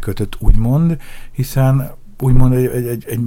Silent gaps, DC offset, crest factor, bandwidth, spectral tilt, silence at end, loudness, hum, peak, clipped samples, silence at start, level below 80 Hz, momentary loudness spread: none; under 0.1%; 14 dB; 16.5 kHz; -8 dB/octave; 0 s; -16 LUFS; none; 0 dBFS; under 0.1%; 0 s; -20 dBFS; 11 LU